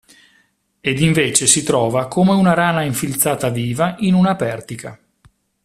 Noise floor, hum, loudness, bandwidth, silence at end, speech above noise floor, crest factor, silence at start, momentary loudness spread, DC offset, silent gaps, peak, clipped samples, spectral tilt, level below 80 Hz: -60 dBFS; none; -16 LUFS; 16 kHz; 0.7 s; 43 dB; 18 dB; 0.85 s; 11 LU; under 0.1%; none; 0 dBFS; under 0.1%; -4.5 dB/octave; -50 dBFS